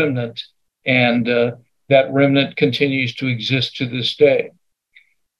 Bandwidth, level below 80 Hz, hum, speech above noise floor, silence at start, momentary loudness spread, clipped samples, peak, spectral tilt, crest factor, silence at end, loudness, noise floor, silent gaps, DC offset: 11.5 kHz; -64 dBFS; none; 38 dB; 0 s; 11 LU; under 0.1%; 0 dBFS; -6.5 dB/octave; 18 dB; 0.9 s; -17 LUFS; -55 dBFS; none; under 0.1%